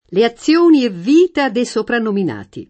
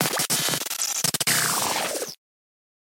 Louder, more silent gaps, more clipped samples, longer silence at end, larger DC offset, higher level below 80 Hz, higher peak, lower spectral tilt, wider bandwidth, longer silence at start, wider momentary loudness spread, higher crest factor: first, -14 LUFS vs -22 LUFS; neither; neither; second, 0.05 s vs 0.85 s; neither; first, -56 dBFS vs -68 dBFS; about the same, -2 dBFS vs -2 dBFS; first, -5.5 dB/octave vs -1 dB/octave; second, 8.8 kHz vs 17 kHz; about the same, 0.1 s vs 0 s; about the same, 8 LU vs 8 LU; second, 14 dB vs 24 dB